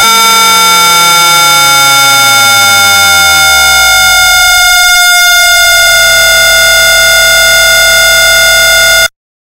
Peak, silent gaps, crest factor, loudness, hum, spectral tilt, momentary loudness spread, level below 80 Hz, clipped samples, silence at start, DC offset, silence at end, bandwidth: 0 dBFS; none; 4 dB; -2 LUFS; none; 1 dB/octave; 0 LU; -30 dBFS; 1%; 0 s; under 0.1%; 0.45 s; over 20 kHz